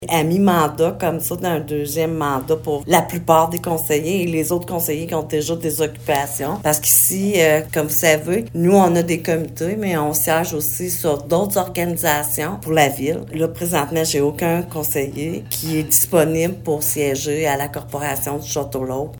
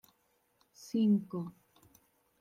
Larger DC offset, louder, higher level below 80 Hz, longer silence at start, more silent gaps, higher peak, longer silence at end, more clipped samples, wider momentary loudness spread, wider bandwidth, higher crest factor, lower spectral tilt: neither; first, -18 LUFS vs -33 LUFS; first, -48 dBFS vs -80 dBFS; second, 0 s vs 0.8 s; neither; first, 0 dBFS vs -20 dBFS; second, 0 s vs 0.9 s; neither; second, 8 LU vs 18 LU; first, over 20 kHz vs 14.5 kHz; about the same, 18 dB vs 16 dB; second, -4.5 dB/octave vs -8 dB/octave